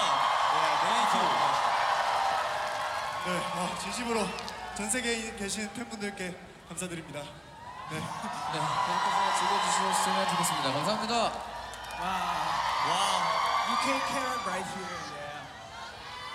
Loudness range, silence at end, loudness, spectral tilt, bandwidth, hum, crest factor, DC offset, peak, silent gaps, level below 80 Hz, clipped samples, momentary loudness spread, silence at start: 7 LU; 0 s; -29 LUFS; -2.5 dB/octave; 16 kHz; none; 16 dB; under 0.1%; -14 dBFS; none; -60 dBFS; under 0.1%; 14 LU; 0 s